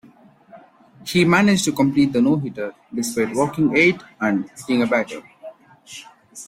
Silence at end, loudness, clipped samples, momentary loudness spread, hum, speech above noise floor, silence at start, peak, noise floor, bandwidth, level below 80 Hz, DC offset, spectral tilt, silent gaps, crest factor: 0.05 s; -19 LUFS; under 0.1%; 20 LU; none; 31 dB; 0.55 s; -2 dBFS; -50 dBFS; 16.5 kHz; -56 dBFS; under 0.1%; -5 dB/octave; none; 18 dB